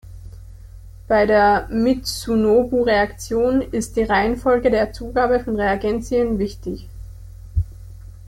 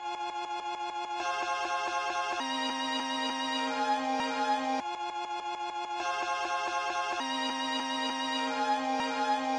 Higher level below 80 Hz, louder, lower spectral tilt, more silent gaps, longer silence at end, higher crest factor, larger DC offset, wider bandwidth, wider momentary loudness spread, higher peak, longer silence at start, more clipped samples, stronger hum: first, -36 dBFS vs -72 dBFS; first, -19 LUFS vs -32 LUFS; first, -5.5 dB/octave vs -1.5 dB/octave; neither; about the same, 0 s vs 0 s; about the same, 14 dB vs 14 dB; neither; first, 16.5 kHz vs 11.5 kHz; first, 16 LU vs 6 LU; first, -4 dBFS vs -18 dBFS; about the same, 0.05 s vs 0 s; neither; neither